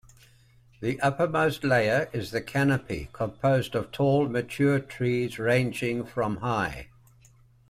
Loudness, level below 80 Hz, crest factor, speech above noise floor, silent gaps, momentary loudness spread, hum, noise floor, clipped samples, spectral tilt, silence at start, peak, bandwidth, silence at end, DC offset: -27 LUFS; -54 dBFS; 16 dB; 32 dB; none; 8 LU; none; -58 dBFS; under 0.1%; -6.5 dB/octave; 0.8 s; -10 dBFS; 15 kHz; 0.85 s; under 0.1%